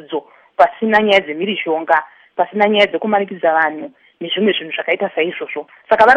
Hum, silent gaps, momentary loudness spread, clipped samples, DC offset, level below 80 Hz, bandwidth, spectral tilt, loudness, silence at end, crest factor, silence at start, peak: none; none; 15 LU; under 0.1%; under 0.1%; -58 dBFS; 8.6 kHz; -5.5 dB/octave; -16 LUFS; 0 s; 16 dB; 0 s; 0 dBFS